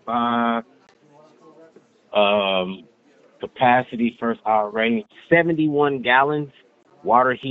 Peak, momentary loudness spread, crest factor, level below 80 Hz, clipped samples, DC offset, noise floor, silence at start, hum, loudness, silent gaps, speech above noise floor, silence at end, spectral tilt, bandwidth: -2 dBFS; 12 LU; 20 dB; -64 dBFS; under 0.1%; under 0.1%; -54 dBFS; 0.05 s; none; -20 LUFS; none; 34 dB; 0 s; -3 dB/octave; 4.5 kHz